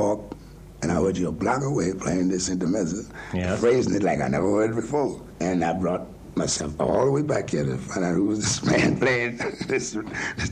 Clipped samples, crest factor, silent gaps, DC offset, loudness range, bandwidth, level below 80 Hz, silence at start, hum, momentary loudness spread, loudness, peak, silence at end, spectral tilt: under 0.1%; 14 dB; none; under 0.1%; 2 LU; 11.5 kHz; -46 dBFS; 0 s; none; 9 LU; -24 LUFS; -10 dBFS; 0 s; -5 dB/octave